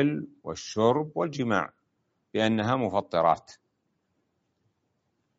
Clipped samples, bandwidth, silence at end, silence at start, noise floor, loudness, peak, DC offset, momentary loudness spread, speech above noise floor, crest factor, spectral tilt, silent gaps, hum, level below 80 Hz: under 0.1%; 8 kHz; 1.85 s; 0 s; -76 dBFS; -27 LUFS; -8 dBFS; under 0.1%; 11 LU; 49 dB; 22 dB; -5 dB/octave; none; none; -66 dBFS